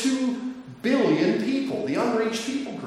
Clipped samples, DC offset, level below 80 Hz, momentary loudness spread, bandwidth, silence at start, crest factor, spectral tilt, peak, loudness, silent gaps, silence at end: under 0.1%; under 0.1%; -68 dBFS; 9 LU; 13 kHz; 0 s; 14 dB; -5 dB/octave; -10 dBFS; -25 LUFS; none; 0 s